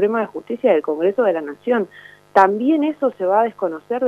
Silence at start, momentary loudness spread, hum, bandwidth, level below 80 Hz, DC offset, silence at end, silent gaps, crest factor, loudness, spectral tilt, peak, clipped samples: 0 s; 9 LU; 50 Hz at -60 dBFS; 8.6 kHz; -68 dBFS; under 0.1%; 0 s; none; 18 dB; -19 LUFS; -7 dB/octave; 0 dBFS; under 0.1%